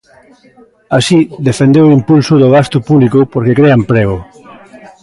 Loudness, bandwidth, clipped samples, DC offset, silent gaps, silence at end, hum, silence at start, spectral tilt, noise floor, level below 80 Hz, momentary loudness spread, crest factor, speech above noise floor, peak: -9 LUFS; 11.5 kHz; under 0.1%; under 0.1%; none; 0.8 s; none; 0.9 s; -7 dB/octave; -35 dBFS; -40 dBFS; 6 LU; 10 dB; 27 dB; 0 dBFS